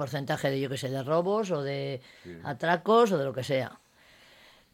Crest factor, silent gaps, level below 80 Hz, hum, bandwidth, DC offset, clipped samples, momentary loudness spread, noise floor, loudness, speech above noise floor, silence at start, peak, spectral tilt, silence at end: 18 dB; none; -70 dBFS; none; 16.5 kHz; under 0.1%; under 0.1%; 16 LU; -58 dBFS; -28 LUFS; 30 dB; 0 s; -12 dBFS; -6 dB/octave; 0.95 s